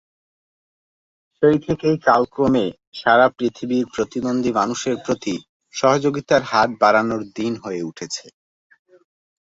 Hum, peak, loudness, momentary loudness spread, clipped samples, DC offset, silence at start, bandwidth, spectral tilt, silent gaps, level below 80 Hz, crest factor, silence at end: none; -2 dBFS; -19 LUFS; 12 LU; under 0.1%; under 0.1%; 1.4 s; 8 kHz; -5 dB/octave; 2.87-2.92 s, 5.49-5.60 s; -56 dBFS; 20 dB; 1.25 s